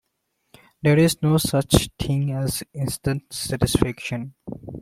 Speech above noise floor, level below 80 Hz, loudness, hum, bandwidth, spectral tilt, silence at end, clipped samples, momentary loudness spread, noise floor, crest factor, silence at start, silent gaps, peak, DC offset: 52 dB; -40 dBFS; -22 LUFS; none; 16.5 kHz; -5.5 dB/octave; 0 s; under 0.1%; 12 LU; -74 dBFS; 20 dB; 0.85 s; none; -2 dBFS; under 0.1%